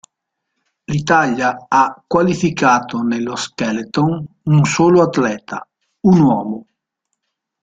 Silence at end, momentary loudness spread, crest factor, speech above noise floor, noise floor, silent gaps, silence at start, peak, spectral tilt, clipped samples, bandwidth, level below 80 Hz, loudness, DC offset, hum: 1 s; 11 LU; 16 dB; 62 dB; -77 dBFS; none; 0.9 s; -2 dBFS; -6 dB/octave; under 0.1%; 9 kHz; -52 dBFS; -16 LUFS; under 0.1%; none